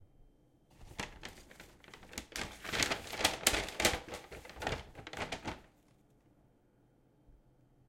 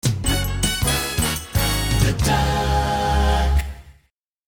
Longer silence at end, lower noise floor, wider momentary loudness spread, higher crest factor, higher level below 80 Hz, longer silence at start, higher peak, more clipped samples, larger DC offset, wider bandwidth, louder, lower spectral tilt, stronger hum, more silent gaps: about the same, 0.55 s vs 0.55 s; first, -69 dBFS vs -64 dBFS; first, 21 LU vs 3 LU; first, 34 dB vs 16 dB; second, -56 dBFS vs -24 dBFS; about the same, 0 s vs 0.05 s; about the same, -6 dBFS vs -6 dBFS; neither; neither; about the same, 16.5 kHz vs 18 kHz; second, -36 LUFS vs -20 LUFS; second, -1.5 dB/octave vs -4 dB/octave; neither; neither